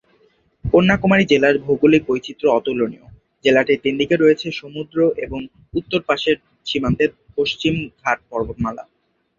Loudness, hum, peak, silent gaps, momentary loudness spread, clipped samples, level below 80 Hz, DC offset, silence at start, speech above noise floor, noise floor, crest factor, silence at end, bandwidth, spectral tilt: -18 LUFS; none; -2 dBFS; none; 12 LU; under 0.1%; -44 dBFS; under 0.1%; 0.65 s; 41 dB; -58 dBFS; 18 dB; 0.55 s; 7.4 kHz; -6.5 dB/octave